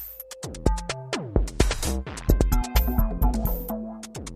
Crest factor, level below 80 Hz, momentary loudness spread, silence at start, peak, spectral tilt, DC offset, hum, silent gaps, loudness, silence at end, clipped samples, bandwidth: 22 dB; -26 dBFS; 13 LU; 0 s; -2 dBFS; -5.5 dB/octave; under 0.1%; none; none; -27 LUFS; 0 s; under 0.1%; 15.5 kHz